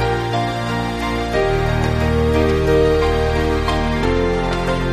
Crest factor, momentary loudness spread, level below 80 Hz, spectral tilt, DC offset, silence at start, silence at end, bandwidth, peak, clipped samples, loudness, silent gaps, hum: 14 dB; 6 LU; -24 dBFS; -6.5 dB/octave; under 0.1%; 0 s; 0 s; 14 kHz; -2 dBFS; under 0.1%; -18 LUFS; none; none